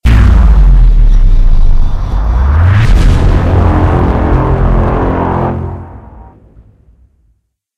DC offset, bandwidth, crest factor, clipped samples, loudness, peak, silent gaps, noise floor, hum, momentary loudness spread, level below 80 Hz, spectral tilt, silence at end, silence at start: under 0.1%; 6.8 kHz; 8 dB; under 0.1%; -10 LUFS; 0 dBFS; none; -57 dBFS; none; 8 LU; -8 dBFS; -8.5 dB/octave; 1.55 s; 0.05 s